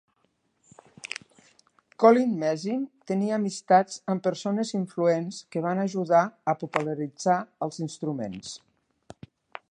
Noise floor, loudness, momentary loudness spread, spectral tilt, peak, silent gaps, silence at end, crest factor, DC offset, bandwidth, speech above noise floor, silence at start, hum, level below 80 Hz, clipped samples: -72 dBFS; -26 LUFS; 16 LU; -6 dB/octave; -4 dBFS; none; 1.15 s; 22 dB; under 0.1%; 10.5 kHz; 46 dB; 1.05 s; none; -72 dBFS; under 0.1%